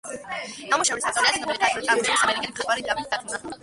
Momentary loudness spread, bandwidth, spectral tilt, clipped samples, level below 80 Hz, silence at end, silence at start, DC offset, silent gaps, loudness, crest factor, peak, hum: 12 LU; 11.5 kHz; -0.5 dB/octave; under 0.1%; -58 dBFS; 0.05 s; 0.05 s; under 0.1%; none; -23 LUFS; 18 dB; -6 dBFS; none